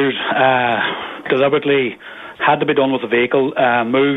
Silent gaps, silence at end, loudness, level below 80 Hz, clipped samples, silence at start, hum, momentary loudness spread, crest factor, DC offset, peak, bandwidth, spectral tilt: none; 0 s; -16 LUFS; -58 dBFS; under 0.1%; 0 s; none; 7 LU; 16 dB; under 0.1%; 0 dBFS; 4.1 kHz; -7.5 dB/octave